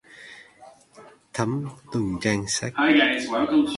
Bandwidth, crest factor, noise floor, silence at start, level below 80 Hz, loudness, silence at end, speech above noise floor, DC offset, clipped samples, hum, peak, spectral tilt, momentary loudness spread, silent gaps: 11.5 kHz; 18 dB; -50 dBFS; 0.15 s; -56 dBFS; -23 LUFS; 0 s; 28 dB; under 0.1%; under 0.1%; none; -6 dBFS; -4 dB/octave; 20 LU; none